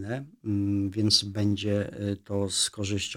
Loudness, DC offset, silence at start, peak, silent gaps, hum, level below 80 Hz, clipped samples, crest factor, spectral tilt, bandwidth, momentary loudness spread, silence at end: -27 LUFS; under 0.1%; 0 s; -8 dBFS; none; none; -60 dBFS; under 0.1%; 20 dB; -4 dB/octave; 16 kHz; 10 LU; 0 s